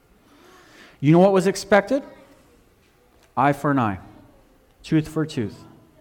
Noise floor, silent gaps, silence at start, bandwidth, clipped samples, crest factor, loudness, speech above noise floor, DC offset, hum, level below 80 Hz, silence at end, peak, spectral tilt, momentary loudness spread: -58 dBFS; none; 1 s; 17 kHz; under 0.1%; 18 dB; -21 LUFS; 38 dB; under 0.1%; none; -56 dBFS; 0.45 s; -6 dBFS; -6.5 dB/octave; 14 LU